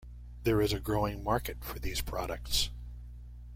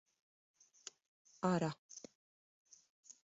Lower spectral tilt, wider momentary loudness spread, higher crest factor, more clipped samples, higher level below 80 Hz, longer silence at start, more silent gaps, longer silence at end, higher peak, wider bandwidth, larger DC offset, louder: second, -4.5 dB/octave vs -6.5 dB/octave; second, 19 LU vs 24 LU; about the same, 18 dB vs 22 dB; neither; first, -42 dBFS vs -80 dBFS; second, 0 s vs 1.4 s; second, none vs 1.78-1.89 s, 2.15-2.65 s, 2.90-3.03 s; about the same, 0 s vs 0.1 s; first, -16 dBFS vs -24 dBFS; first, 16.5 kHz vs 8 kHz; neither; first, -33 LUFS vs -40 LUFS